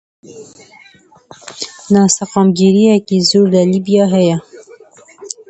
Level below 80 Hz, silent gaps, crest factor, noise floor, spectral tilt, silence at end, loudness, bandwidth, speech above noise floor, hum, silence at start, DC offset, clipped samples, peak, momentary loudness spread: -56 dBFS; none; 14 dB; -42 dBFS; -5.5 dB/octave; 0.2 s; -11 LUFS; 8.8 kHz; 29 dB; none; 0.3 s; under 0.1%; under 0.1%; 0 dBFS; 16 LU